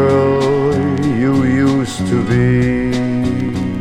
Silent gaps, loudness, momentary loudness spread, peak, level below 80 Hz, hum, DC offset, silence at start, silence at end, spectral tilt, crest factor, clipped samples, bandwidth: none; -15 LUFS; 4 LU; -2 dBFS; -36 dBFS; none; under 0.1%; 0 s; 0 s; -7.5 dB/octave; 12 dB; under 0.1%; 12 kHz